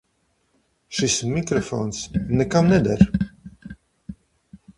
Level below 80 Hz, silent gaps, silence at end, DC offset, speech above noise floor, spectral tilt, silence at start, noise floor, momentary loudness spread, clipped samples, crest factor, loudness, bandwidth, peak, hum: -42 dBFS; none; 0.2 s; under 0.1%; 48 dB; -5.5 dB/octave; 0.9 s; -68 dBFS; 24 LU; under 0.1%; 22 dB; -21 LUFS; 11.5 kHz; 0 dBFS; none